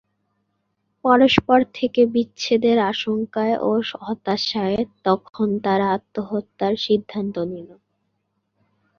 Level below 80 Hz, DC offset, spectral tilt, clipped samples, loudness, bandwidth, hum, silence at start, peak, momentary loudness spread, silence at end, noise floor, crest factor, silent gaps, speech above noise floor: -56 dBFS; under 0.1%; -5.5 dB/octave; under 0.1%; -21 LUFS; 7.2 kHz; none; 1.05 s; -2 dBFS; 11 LU; 1.25 s; -73 dBFS; 20 dB; none; 53 dB